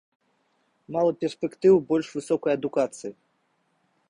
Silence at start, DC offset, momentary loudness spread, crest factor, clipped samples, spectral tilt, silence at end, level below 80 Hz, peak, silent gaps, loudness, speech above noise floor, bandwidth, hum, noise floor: 0.9 s; under 0.1%; 12 LU; 18 dB; under 0.1%; -6.5 dB/octave; 0.95 s; -68 dBFS; -8 dBFS; none; -25 LUFS; 47 dB; 11 kHz; none; -71 dBFS